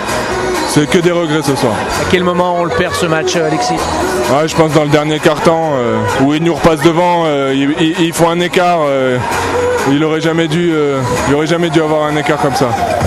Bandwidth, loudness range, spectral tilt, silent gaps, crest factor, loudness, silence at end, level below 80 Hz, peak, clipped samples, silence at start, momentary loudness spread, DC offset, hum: 15 kHz; 1 LU; -5 dB/octave; none; 12 dB; -12 LUFS; 0 s; -38 dBFS; 0 dBFS; 0.1%; 0 s; 3 LU; under 0.1%; none